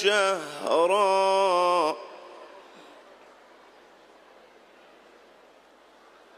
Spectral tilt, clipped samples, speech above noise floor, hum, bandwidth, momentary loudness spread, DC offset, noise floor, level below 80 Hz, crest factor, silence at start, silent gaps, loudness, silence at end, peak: -2.5 dB/octave; under 0.1%; 33 dB; none; 14.5 kHz; 24 LU; under 0.1%; -56 dBFS; -82 dBFS; 18 dB; 0 s; none; -24 LUFS; 3.8 s; -10 dBFS